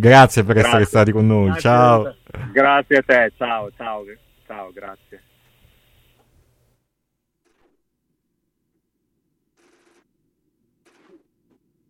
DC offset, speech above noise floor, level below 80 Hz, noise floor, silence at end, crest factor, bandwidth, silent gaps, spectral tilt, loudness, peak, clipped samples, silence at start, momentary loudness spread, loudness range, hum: under 0.1%; 61 dB; -48 dBFS; -76 dBFS; 7 s; 20 dB; 16 kHz; none; -6 dB/octave; -15 LUFS; 0 dBFS; under 0.1%; 0 s; 23 LU; 21 LU; none